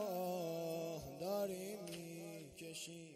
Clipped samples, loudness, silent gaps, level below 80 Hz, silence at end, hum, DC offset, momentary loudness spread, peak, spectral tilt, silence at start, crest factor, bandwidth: under 0.1%; -45 LUFS; none; -74 dBFS; 0 s; none; under 0.1%; 9 LU; -30 dBFS; -4.5 dB/octave; 0 s; 16 dB; 16 kHz